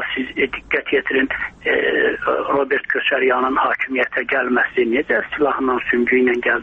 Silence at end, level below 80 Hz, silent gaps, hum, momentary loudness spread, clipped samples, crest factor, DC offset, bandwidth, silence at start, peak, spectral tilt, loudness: 0 s; -50 dBFS; none; none; 4 LU; under 0.1%; 14 dB; under 0.1%; 6 kHz; 0 s; -4 dBFS; -6 dB/octave; -18 LUFS